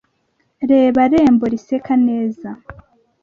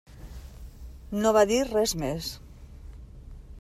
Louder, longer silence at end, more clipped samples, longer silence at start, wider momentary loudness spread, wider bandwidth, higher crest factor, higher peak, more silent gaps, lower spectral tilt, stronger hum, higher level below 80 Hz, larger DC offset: first, -15 LUFS vs -25 LUFS; first, 0.5 s vs 0.05 s; neither; first, 0.6 s vs 0.1 s; second, 18 LU vs 26 LU; second, 7 kHz vs 15 kHz; second, 14 dB vs 20 dB; first, -2 dBFS vs -8 dBFS; neither; first, -7.5 dB/octave vs -4 dB/octave; neither; about the same, -48 dBFS vs -44 dBFS; neither